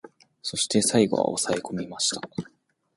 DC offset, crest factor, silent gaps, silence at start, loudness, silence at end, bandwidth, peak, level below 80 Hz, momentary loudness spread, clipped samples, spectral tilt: under 0.1%; 20 dB; none; 0.05 s; -25 LUFS; 0.55 s; 11.5 kHz; -6 dBFS; -62 dBFS; 15 LU; under 0.1%; -3.5 dB/octave